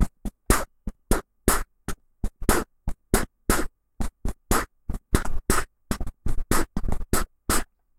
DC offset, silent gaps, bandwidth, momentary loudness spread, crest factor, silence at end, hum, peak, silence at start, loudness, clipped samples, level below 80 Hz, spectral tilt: under 0.1%; none; 16.5 kHz; 13 LU; 22 dB; 0.35 s; none; -2 dBFS; 0 s; -28 LUFS; under 0.1%; -30 dBFS; -4 dB/octave